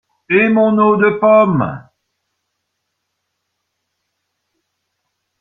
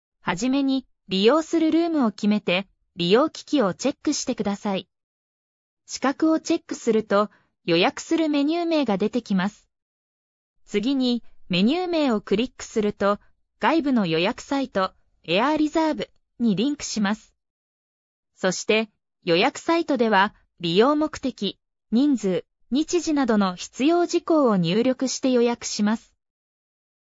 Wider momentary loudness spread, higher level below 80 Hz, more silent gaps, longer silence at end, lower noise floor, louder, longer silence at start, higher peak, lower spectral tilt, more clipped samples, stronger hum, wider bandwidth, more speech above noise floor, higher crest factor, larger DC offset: about the same, 10 LU vs 8 LU; about the same, -58 dBFS vs -58 dBFS; second, none vs 5.03-5.77 s, 9.82-10.56 s, 17.50-18.23 s; first, 3.6 s vs 1.05 s; second, -73 dBFS vs under -90 dBFS; first, -12 LUFS vs -23 LUFS; about the same, 0.3 s vs 0.25 s; first, -2 dBFS vs -6 dBFS; first, -10 dB/octave vs -5 dB/octave; neither; neither; second, 4 kHz vs 8 kHz; second, 61 dB vs over 68 dB; about the same, 16 dB vs 18 dB; neither